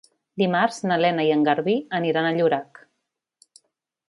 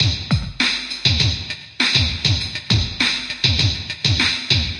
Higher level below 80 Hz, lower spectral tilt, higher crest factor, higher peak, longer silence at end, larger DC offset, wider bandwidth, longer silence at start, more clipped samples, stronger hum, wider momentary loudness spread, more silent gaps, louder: second, -74 dBFS vs -34 dBFS; first, -6 dB/octave vs -3.5 dB/octave; about the same, 18 dB vs 18 dB; second, -6 dBFS vs -2 dBFS; first, 1.45 s vs 0 s; neither; about the same, 11.5 kHz vs 11 kHz; first, 0.35 s vs 0 s; neither; neither; about the same, 5 LU vs 5 LU; neither; second, -22 LUFS vs -18 LUFS